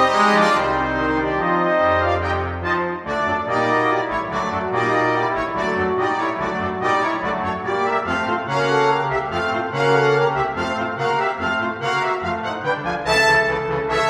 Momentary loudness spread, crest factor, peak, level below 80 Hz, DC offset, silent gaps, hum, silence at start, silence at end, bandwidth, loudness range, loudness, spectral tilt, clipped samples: 7 LU; 16 dB; -4 dBFS; -44 dBFS; under 0.1%; none; none; 0 s; 0 s; 14 kHz; 1 LU; -20 LUFS; -5 dB/octave; under 0.1%